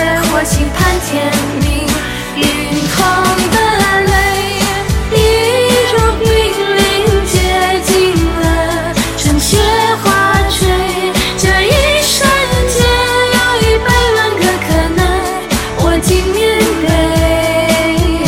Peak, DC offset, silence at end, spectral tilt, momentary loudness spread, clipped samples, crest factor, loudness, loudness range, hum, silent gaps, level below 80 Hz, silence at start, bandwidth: 0 dBFS; under 0.1%; 0 s; -4 dB/octave; 4 LU; under 0.1%; 12 dB; -11 LUFS; 2 LU; none; none; -20 dBFS; 0 s; 17 kHz